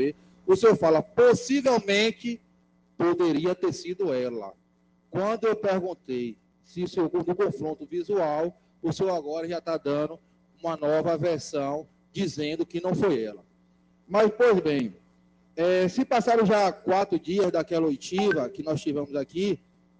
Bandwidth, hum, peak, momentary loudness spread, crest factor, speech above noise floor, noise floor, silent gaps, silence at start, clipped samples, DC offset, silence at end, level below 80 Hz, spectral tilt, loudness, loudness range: 9.6 kHz; none; -8 dBFS; 13 LU; 18 dB; 40 dB; -65 dBFS; none; 0 s; under 0.1%; under 0.1%; 0.45 s; -64 dBFS; -5.5 dB/octave; -26 LUFS; 6 LU